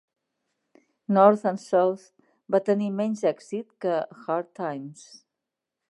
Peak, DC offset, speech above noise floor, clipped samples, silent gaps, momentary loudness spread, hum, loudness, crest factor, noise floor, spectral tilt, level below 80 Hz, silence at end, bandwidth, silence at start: -4 dBFS; under 0.1%; 61 dB; under 0.1%; none; 17 LU; none; -25 LUFS; 24 dB; -86 dBFS; -7 dB/octave; -82 dBFS; 0.95 s; 11 kHz; 1.1 s